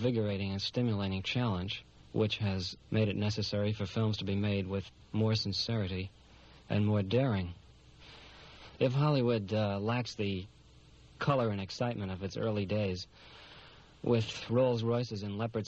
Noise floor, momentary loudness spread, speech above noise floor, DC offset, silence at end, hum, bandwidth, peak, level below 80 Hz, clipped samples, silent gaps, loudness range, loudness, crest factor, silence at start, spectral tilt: -58 dBFS; 17 LU; 26 dB; under 0.1%; 0 s; none; 7.8 kHz; -16 dBFS; -62 dBFS; under 0.1%; none; 2 LU; -33 LUFS; 18 dB; 0 s; -6.5 dB/octave